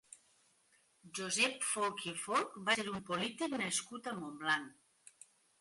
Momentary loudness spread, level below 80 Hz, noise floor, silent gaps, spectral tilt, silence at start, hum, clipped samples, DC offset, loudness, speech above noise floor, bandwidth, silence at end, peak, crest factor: 11 LU; -78 dBFS; -72 dBFS; none; -2 dB/octave; 0.1 s; none; under 0.1%; under 0.1%; -36 LUFS; 35 dB; 12 kHz; 0.9 s; -18 dBFS; 22 dB